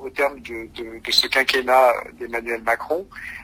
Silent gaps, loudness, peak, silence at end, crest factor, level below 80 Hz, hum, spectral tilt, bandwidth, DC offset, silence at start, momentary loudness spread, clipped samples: none; -20 LUFS; -2 dBFS; 0 s; 20 dB; -52 dBFS; none; -1.5 dB/octave; 16 kHz; under 0.1%; 0 s; 17 LU; under 0.1%